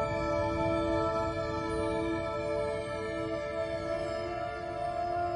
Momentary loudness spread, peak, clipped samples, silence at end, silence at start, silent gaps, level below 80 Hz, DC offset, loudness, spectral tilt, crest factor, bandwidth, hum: 5 LU; -18 dBFS; under 0.1%; 0 s; 0 s; none; -48 dBFS; under 0.1%; -33 LUFS; -6.5 dB/octave; 14 dB; 11 kHz; none